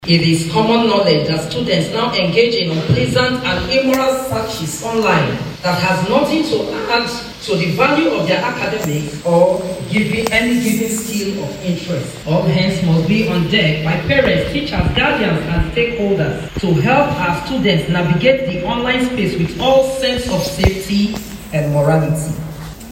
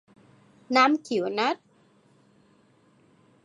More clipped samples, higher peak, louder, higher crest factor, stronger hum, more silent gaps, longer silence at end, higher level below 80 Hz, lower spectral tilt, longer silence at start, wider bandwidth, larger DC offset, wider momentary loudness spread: neither; first, 0 dBFS vs -6 dBFS; first, -16 LUFS vs -24 LUFS; second, 16 dB vs 24 dB; neither; neither; second, 0 s vs 1.9 s; first, -34 dBFS vs -82 dBFS; first, -5.5 dB/octave vs -4 dB/octave; second, 0 s vs 0.7 s; first, 16.5 kHz vs 11 kHz; neither; about the same, 7 LU vs 7 LU